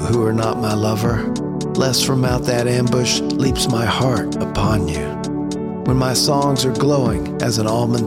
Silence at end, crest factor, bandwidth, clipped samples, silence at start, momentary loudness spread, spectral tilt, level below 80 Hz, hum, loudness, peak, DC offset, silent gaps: 0 s; 14 dB; 16.5 kHz; under 0.1%; 0 s; 7 LU; -5 dB/octave; -36 dBFS; none; -18 LUFS; -4 dBFS; 0.3%; none